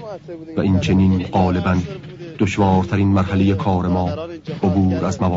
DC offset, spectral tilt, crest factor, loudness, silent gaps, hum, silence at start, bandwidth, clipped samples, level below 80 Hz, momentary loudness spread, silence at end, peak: under 0.1%; -7.5 dB/octave; 14 dB; -18 LUFS; none; none; 0 s; 7.8 kHz; under 0.1%; -42 dBFS; 13 LU; 0 s; -4 dBFS